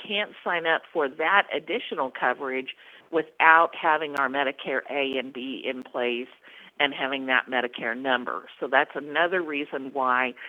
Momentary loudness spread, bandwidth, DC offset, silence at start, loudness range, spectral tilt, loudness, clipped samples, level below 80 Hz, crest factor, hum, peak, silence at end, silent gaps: 11 LU; 12.5 kHz; under 0.1%; 0 s; 4 LU; -5 dB/octave; -25 LUFS; under 0.1%; -80 dBFS; 26 dB; none; 0 dBFS; 0 s; none